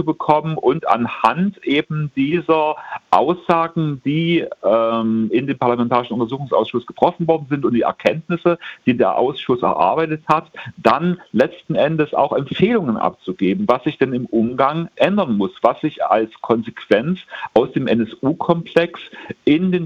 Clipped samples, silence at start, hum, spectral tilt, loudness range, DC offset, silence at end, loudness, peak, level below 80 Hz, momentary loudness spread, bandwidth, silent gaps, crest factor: under 0.1%; 0 s; none; -8 dB/octave; 1 LU; under 0.1%; 0 s; -18 LUFS; 0 dBFS; -56 dBFS; 5 LU; 8.4 kHz; none; 18 dB